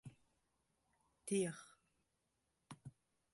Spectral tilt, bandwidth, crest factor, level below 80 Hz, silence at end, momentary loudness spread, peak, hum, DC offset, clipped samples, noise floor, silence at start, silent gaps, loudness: -5 dB/octave; 11.5 kHz; 22 dB; -84 dBFS; 0.45 s; 21 LU; -28 dBFS; none; under 0.1%; under 0.1%; -86 dBFS; 0.05 s; none; -43 LUFS